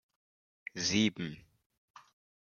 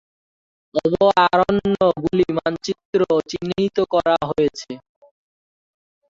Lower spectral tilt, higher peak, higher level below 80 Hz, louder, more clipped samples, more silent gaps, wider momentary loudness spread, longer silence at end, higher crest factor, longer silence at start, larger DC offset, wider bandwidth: second, -3.5 dB/octave vs -6 dB/octave; second, -16 dBFS vs -2 dBFS; second, -72 dBFS vs -52 dBFS; second, -32 LUFS vs -19 LUFS; neither; second, none vs 2.85-2.93 s; first, 20 LU vs 11 LU; second, 1.05 s vs 1.35 s; about the same, 22 dB vs 18 dB; about the same, 0.75 s vs 0.75 s; neither; about the same, 7.2 kHz vs 7.8 kHz